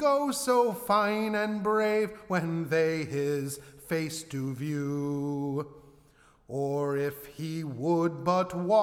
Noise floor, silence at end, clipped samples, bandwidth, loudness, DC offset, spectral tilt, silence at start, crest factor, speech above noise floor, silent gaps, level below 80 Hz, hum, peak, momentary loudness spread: -61 dBFS; 0 s; under 0.1%; 17.5 kHz; -29 LUFS; under 0.1%; -5.5 dB/octave; 0 s; 16 dB; 32 dB; none; -66 dBFS; none; -12 dBFS; 9 LU